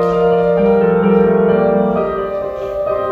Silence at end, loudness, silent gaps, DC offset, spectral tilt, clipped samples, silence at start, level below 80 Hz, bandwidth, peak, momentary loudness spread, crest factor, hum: 0 s; -14 LUFS; none; under 0.1%; -9.5 dB/octave; under 0.1%; 0 s; -40 dBFS; 5 kHz; 0 dBFS; 9 LU; 14 dB; none